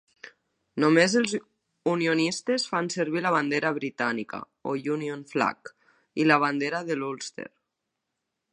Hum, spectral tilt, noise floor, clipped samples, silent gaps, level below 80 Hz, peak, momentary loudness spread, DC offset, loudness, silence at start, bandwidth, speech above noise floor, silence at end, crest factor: none; -4.5 dB/octave; -83 dBFS; under 0.1%; none; -76 dBFS; -4 dBFS; 15 LU; under 0.1%; -26 LUFS; 0.25 s; 11 kHz; 57 dB; 1.05 s; 22 dB